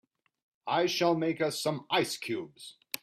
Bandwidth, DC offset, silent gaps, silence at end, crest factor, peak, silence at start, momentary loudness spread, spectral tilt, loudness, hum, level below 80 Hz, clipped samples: 16 kHz; under 0.1%; none; 0.05 s; 20 dB; -12 dBFS; 0.65 s; 16 LU; -4 dB/octave; -30 LUFS; none; -76 dBFS; under 0.1%